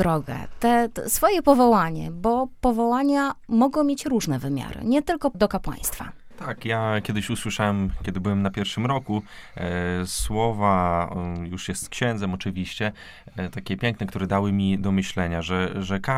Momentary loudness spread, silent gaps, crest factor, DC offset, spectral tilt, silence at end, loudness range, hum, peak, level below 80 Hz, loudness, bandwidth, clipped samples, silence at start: 10 LU; none; 20 dB; under 0.1%; -5.5 dB/octave; 0 s; 5 LU; none; -4 dBFS; -40 dBFS; -24 LUFS; 17.5 kHz; under 0.1%; 0 s